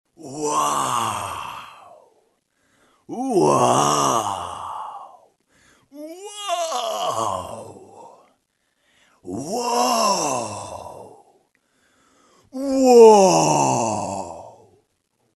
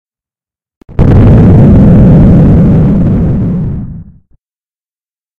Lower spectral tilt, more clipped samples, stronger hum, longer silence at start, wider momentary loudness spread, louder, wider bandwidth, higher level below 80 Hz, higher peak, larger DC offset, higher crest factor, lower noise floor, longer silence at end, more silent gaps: second, -4 dB/octave vs -11.5 dB/octave; second, under 0.1% vs 5%; neither; second, 0.2 s vs 0.9 s; first, 23 LU vs 13 LU; second, -19 LUFS vs -5 LUFS; first, 12 kHz vs 4.4 kHz; second, -62 dBFS vs -16 dBFS; about the same, 0 dBFS vs 0 dBFS; neither; first, 22 dB vs 6 dB; second, -69 dBFS vs under -90 dBFS; second, 0.85 s vs 1.35 s; neither